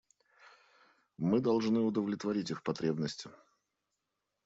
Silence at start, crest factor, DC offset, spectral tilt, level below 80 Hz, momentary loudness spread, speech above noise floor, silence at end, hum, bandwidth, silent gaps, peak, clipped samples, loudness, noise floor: 1.2 s; 18 dB; under 0.1%; -6.5 dB/octave; -74 dBFS; 9 LU; 53 dB; 1.15 s; none; 7.8 kHz; none; -18 dBFS; under 0.1%; -33 LUFS; -86 dBFS